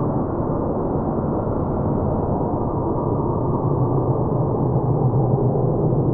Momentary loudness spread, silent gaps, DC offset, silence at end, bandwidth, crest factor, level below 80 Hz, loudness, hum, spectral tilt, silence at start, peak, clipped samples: 3 LU; none; under 0.1%; 0 s; 2 kHz; 12 dB; -34 dBFS; -21 LUFS; none; -15.5 dB/octave; 0 s; -8 dBFS; under 0.1%